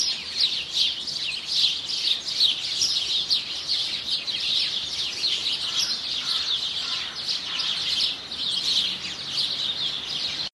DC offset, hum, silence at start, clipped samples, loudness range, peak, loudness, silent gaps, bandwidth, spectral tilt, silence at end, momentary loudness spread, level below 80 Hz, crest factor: under 0.1%; none; 0 s; under 0.1%; 2 LU; -8 dBFS; -23 LUFS; none; 12.5 kHz; 0.5 dB/octave; 0.05 s; 5 LU; -60 dBFS; 20 dB